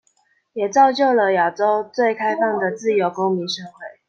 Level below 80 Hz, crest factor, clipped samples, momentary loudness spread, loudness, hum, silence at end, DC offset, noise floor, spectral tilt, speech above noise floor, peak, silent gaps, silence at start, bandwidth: -70 dBFS; 16 dB; under 0.1%; 11 LU; -19 LUFS; none; 0.2 s; under 0.1%; -63 dBFS; -4.5 dB/octave; 45 dB; -2 dBFS; none; 0.55 s; 7.6 kHz